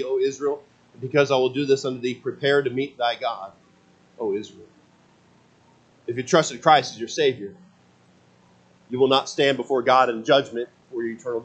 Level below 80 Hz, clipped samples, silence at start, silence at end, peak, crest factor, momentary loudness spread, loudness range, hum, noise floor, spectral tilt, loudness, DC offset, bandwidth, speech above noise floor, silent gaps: -72 dBFS; under 0.1%; 0 s; 0 s; -2 dBFS; 22 dB; 15 LU; 6 LU; none; -57 dBFS; -4.5 dB/octave; -22 LUFS; under 0.1%; 8.6 kHz; 35 dB; none